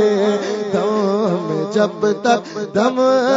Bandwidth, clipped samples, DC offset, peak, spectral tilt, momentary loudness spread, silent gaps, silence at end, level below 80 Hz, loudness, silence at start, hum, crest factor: 7.8 kHz; under 0.1%; under 0.1%; -2 dBFS; -5.5 dB/octave; 5 LU; none; 0 s; -66 dBFS; -18 LUFS; 0 s; none; 16 dB